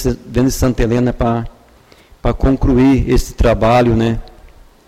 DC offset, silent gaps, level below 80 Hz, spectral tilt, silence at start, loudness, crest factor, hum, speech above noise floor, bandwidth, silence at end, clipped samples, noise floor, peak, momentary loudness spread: under 0.1%; none; -22 dBFS; -7 dB/octave; 0 s; -15 LUFS; 12 dB; none; 33 dB; 15.5 kHz; 0.6 s; under 0.1%; -46 dBFS; -4 dBFS; 10 LU